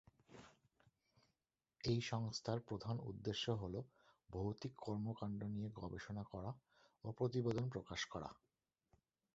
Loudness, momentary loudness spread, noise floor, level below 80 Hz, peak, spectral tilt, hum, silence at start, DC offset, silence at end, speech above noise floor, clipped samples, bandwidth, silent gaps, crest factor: -46 LUFS; 14 LU; under -90 dBFS; -68 dBFS; -26 dBFS; -5.5 dB/octave; none; 0.3 s; under 0.1%; 1 s; over 46 dB; under 0.1%; 7.6 kHz; none; 20 dB